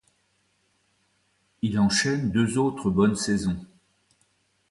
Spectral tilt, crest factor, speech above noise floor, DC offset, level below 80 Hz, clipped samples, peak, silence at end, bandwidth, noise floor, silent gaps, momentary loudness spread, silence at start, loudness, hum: -5 dB/octave; 16 dB; 46 dB; under 0.1%; -52 dBFS; under 0.1%; -10 dBFS; 1.05 s; 11.5 kHz; -69 dBFS; none; 8 LU; 1.65 s; -24 LUFS; none